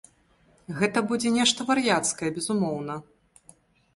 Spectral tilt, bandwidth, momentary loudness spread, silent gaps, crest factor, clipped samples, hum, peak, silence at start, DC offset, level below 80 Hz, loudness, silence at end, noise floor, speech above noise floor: -3.5 dB/octave; 11.5 kHz; 13 LU; none; 20 dB; under 0.1%; none; -8 dBFS; 0.7 s; under 0.1%; -64 dBFS; -25 LUFS; 0.95 s; -62 dBFS; 37 dB